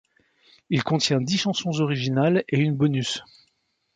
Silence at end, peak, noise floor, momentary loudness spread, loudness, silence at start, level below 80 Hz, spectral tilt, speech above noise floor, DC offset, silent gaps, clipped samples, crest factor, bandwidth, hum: 0.75 s; -8 dBFS; -71 dBFS; 6 LU; -23 LUFS; 0.7 s; -62 dBFS; -5.5 dB/octave; 49 dB; under 0.1%; none; under 0.1%; 16 dB; 9.4 kHz; none